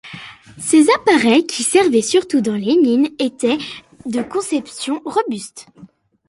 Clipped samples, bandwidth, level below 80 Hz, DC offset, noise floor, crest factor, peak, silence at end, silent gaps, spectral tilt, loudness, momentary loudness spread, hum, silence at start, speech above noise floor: under 0.1%; 11.5 kHz; -60 dBFS; under 0.1%; -36 dBFS; 16 dB; -2 dBFS; 0.45 s; none; -3.5 dB/octave; -16 LUFS; 17 LU; none; 0.05 s; 20 dB